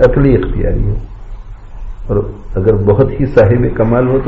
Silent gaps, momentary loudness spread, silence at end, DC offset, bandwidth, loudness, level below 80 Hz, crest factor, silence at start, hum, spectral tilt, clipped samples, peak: none; 23 LU; 0 s; under 0.1%; 6 kHz; -12 LUFS; -20 dBFS; 12 dB; 0 s; none; -9 dB/octave; under 0.1%; 0 dBFS